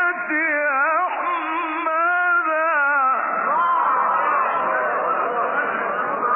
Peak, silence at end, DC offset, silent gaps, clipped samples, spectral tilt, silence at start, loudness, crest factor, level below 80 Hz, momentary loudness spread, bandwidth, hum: -10 dBFS; 0 s; under 0.1%; none; under 0.1%; -7.5 dB/octave; 0 s; -20 LUFS; 10 dB; under -90 dBFS; 5 LU; 3.7 kHz; none